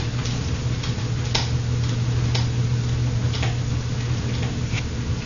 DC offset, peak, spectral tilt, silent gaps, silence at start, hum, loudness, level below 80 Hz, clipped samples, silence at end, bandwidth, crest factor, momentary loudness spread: under 0.1%; -2 dBFS; -5.5 dB/octave; none; 0 s; none; -24 LUFS; -34 dBFS; under 0.1%; 0 s; 7.4 kHz; 22 dB; 3 LU